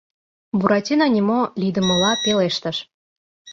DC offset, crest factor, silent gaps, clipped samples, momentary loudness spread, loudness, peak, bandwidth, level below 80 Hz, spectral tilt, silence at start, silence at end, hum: under 0.1%; 18 dB; 2.94-3.45 s; under 0.1%; 8 LU; -19 LUFS; -2 dBFS; 7.6 kHz; -56 dBFS; -4.5 dB/octave; 0.55 s; 0 s; none